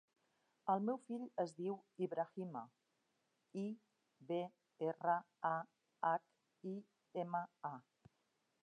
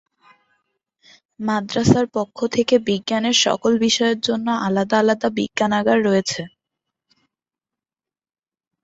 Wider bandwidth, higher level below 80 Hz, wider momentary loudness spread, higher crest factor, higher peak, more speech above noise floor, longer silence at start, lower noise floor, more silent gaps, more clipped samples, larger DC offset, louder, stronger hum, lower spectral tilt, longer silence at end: first, 9.6 kHz vs 8 kHz; second, under -90 dBFS vs -54 dBFS; first, 13 LU vs 7 LU; about the same, 20 dB vs 20 dB; second, -24 dBFS vs -2 dBFS; second, 41 dB vs over 71 dB; second, 0.65 s vs 1.4 s; second, -84 dBFS vs under -90 dBFS; neither; neither; neither; second, -44 LUFS vs -19 LUFS; neither; first, -7.5 dB/octave vs -4 dB/octave; second, 0.8 s vs 2.35 s